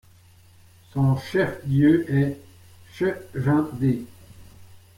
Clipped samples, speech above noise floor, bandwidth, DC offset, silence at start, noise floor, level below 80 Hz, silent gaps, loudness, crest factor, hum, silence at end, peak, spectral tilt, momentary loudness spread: under 0.1%; 31 dB; 15.5 kHz; under 0.1%; 0.95 s; -52 dBFS; -54 dBFS; none; -23 LUFS; 16 dB; none; 0.2 s; -8 dBFS; -8.5 dB/octave; 11 LU